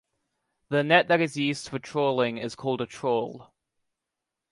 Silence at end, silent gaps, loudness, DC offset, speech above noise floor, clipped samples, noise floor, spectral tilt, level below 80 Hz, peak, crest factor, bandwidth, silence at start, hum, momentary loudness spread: 1.1 s; none; -26 LUFS; under 0.1%; 60 dB; under 0.1%; -86 dBFS; -5 dB/octave; -70 dBFS; -6 dBFS; 22 dB; 11.5 kHz; 0.7 s; none; 11 LU